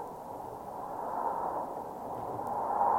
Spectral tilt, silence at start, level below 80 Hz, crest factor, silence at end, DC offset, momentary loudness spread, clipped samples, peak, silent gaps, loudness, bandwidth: -6.5 dB/octave; 0 s; -64 dBFS; 18 dB; 0 s; under 0.1%; 9 LU; under 0.1%; -16 dBFS; none; -37 LUFS; 16.5 kHz